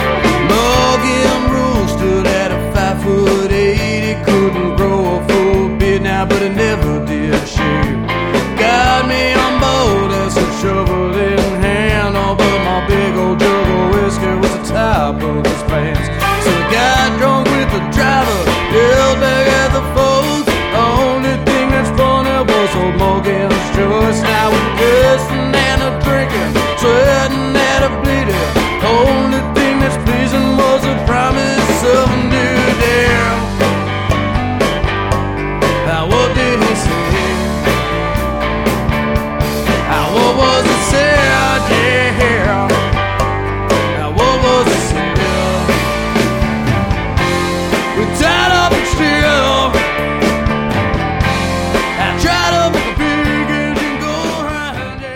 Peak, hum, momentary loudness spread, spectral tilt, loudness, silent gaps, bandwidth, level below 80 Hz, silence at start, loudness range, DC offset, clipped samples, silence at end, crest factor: 0 dBFS; none; 5 LU; -5 dB/octave; -13 LUFS; none; 19.5 kHz; -24 dBFS; 0 s; 2 LU; under 0.1%; under 0.1%; 0 s; 12 dB